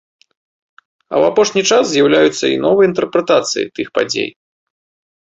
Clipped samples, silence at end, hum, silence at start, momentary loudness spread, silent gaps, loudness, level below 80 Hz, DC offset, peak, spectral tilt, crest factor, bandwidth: under 0.1%; 0.9 s; none; 1.1 s; 8 LU; none; -14 LUFS; -58 dBFS; under 0.1%; 0 dBFS; -3.5 dB/octave; 14 dB; 8 kHz